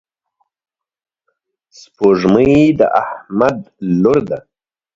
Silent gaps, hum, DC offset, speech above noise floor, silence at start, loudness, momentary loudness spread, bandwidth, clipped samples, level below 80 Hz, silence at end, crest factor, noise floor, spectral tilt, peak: none; none; under 0.1%; 74 dB; 2 s; -14 LUFS; 12 LU; 7.6 kHz; under 0.1%; -46 dBFS; 0.55 s; 16 dB; -87 dBFS; -8 dB/octave; 0 dBFS